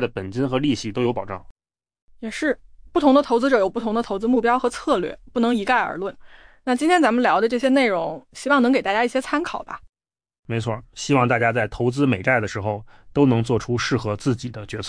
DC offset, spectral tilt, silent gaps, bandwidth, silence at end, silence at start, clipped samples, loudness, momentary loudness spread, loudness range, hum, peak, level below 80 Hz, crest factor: under 0.1%; -6 dB/octave; 1.51-1.55 s, 2.02-2.08 s, 10.39-10.43 s; 10.5 kHz; 0 s; 0 s; under 0.1%; -21 LUFS; 13 LU; 3 LU; none; -6 dBFS; -50 dBFS; 16 dB